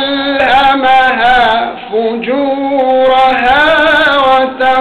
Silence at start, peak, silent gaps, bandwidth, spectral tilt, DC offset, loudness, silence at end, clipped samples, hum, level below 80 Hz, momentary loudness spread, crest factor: 0 s; -4 dBFS; none; 10 kHz; -4.5 dB/octave; under 0.1%; -9 LUFS; 0 s; under 0.1%; none; -38 dBFS; 7 LU; 6 dB